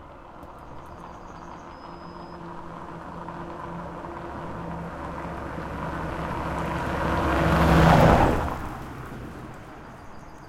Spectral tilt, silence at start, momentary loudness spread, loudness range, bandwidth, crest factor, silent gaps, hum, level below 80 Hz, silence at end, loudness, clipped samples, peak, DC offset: -7 dB/octave; 0 s; 24 LU; 17 LU; 16.5 kHz; 24 dB; none; none; -36 dBFS; 0 s; -25 LUFS; under 0.1%; -2 dBFS; under 0.1%